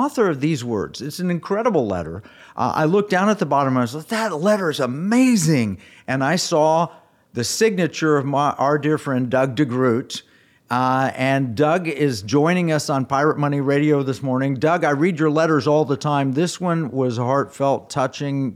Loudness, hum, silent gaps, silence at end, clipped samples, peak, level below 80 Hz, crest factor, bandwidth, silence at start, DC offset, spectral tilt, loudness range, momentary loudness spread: -20 LUFS; none; none; 0 s; under 0.1%; -6 dBFS; -62 dBFS; 14 dB; 16 kHz; 0 s; under 0.1%; -6 dB/octave; 2 LU; 7 LU